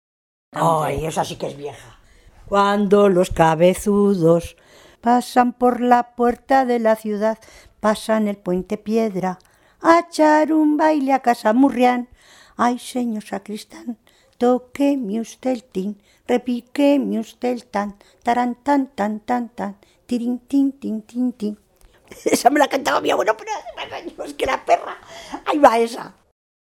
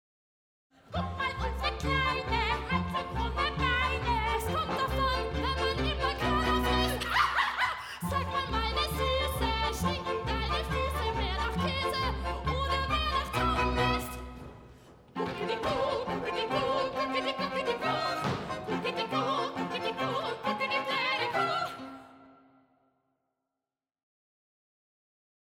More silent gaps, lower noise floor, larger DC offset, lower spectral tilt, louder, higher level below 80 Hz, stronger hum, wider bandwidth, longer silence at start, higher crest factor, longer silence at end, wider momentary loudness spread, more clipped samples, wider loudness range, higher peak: neither; second, -46 dBFS vs under -90 dBFS; neither; about the same, -5.5 dB/octave vs -5 dB/octave; first, -19 LUFS vs -30 LUFS; second, -48 dBFS vs -40 dBFS; neither; about the same, 17 kHz vs 16.5 kHz; second, 0.55 s vs 0.9 s; about the same, 20 dB vs 20 dB; second, 0.7 s vs 3.25 s; first, 16 LU vs 6 LU; neither; about the same, 6 LU vs 4 LU; first, 0 dBFS vs -12 dBFS